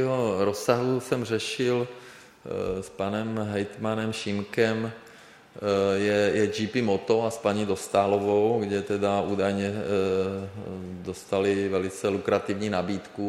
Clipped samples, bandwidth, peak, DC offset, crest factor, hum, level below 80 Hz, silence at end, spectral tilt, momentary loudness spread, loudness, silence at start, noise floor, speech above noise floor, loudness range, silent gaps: under 0.1%; 15.5 kHz; -8 dBFS; under 0.1%; 18 dB; none; -60 dBFS; 0 s; -5.5 dB/octave; 11 LU; -27 LUFS; 0 s; -50 dBFS; 24 dB; 5 LU; none